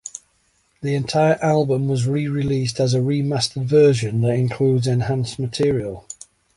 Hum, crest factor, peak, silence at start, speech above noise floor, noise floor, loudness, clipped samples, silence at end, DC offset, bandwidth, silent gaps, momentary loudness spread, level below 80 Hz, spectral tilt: none; 16 dB; -4 dBFS; 0.05 s; 45 dB; -63 dBFS; -20 LUFS; under 0.1%; 0.45 s; under 0.1%; 11.5 kHz; none; 14 LU; -50 dBFS; -6.5 dB/octave